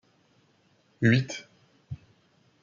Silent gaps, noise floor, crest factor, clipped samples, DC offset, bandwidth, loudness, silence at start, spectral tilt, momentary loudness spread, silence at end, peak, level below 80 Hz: none; -66 dBFS; 22 dB; under 0.1%; under 0.1%; 7.6 kHz; -26 LUFS; 1 s; -6.5 dB/octave; 21 LU; 0.7 s; -10 dBFS; -66 dBFS